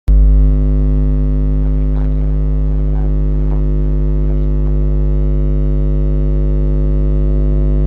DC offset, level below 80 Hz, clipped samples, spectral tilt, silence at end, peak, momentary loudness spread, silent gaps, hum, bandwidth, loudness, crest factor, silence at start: under 0.1%; -12 dBFS; under 0.1%; -12 dB/octave; 0 s; -2 dBFS; 3 LU; none; 50 Hz at -15 dBFS; 2.1 kHz; -16 LUFS; 10 dB; 0.1 s